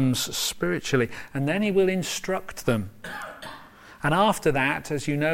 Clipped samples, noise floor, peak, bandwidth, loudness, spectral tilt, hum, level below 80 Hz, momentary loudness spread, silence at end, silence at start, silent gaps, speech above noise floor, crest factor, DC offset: under 0.1%; -47 dBFS; -8 dBFS; 16.5 kHz; -25 LUFS; -4.5 dB/octave; none; -50 dBFS; 14 LU; 0 s; 0 s; none; 22 dB; 18 dB; under 0.1%